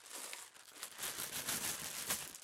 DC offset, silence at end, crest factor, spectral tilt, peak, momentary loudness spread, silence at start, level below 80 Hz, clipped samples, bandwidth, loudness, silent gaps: under 0.1%; 0 s; 22 dB; 0 dB/octave; -22 dBFS; 12 LU; 0 s; -74 dBFS; under 0.1%; 16.5 kHz; -41 LUFS; none